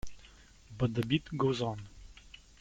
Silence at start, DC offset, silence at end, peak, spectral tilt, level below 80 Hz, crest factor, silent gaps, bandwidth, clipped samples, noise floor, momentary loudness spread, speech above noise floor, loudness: 0.05 s; under 0.1%; 0 s; -16 dBFS; -6.5 dB/octave; -54 dBFS; 18 dB; none; 13.5 kHz; under 0.1%; -57 dBFS; 23 LU; 25 dB; -33 LUFS